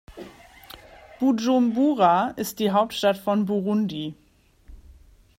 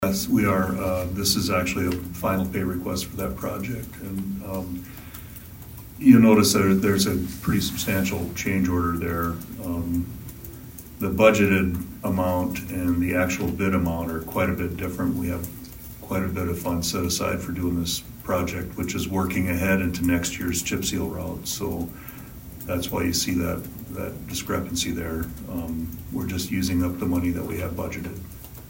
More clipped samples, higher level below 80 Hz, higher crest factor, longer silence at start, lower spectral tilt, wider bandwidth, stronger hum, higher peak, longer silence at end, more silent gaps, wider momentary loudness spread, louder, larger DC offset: neither; second, -54 dBFS vs -42 dBFS; about the same, 18 dB vs 22 dB; about the same, 0.1 s vs 0 s; about the same, -5.5 dB/octave vs -5 dB/octave; about the same, 16 kHz vs 16.5 kHz; neither; second, -6 dBFS vs -2 dBFS; first, 0.65 s vs 0 s; neither; first, 24 LU vs 15 LU; about the same, -22 LUFS vs -24 LUFS; neither